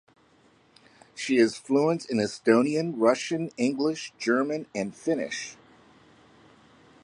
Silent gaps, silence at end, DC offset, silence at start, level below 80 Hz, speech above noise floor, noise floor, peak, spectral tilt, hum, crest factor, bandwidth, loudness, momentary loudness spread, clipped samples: none; 1.5 s; under 0.1%; 1.15 s; -72 dBFS; 35 dB; -61 dBFS; -8 dBFS; -5 dB/octave; none; 20 dB; 11 kHz; -26 LUFS; 11 LU; under 0.1%